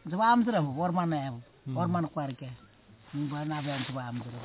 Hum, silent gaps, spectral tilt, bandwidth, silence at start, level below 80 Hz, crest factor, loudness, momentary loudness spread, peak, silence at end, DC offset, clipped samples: none; none; -6 dB/octave; 4 kHz; 0.05 s; -66 dBFS; 18 dB; -31 LUFS; 17 LU; -12 dBFS; 0 s; under 0.1%; under 0.1%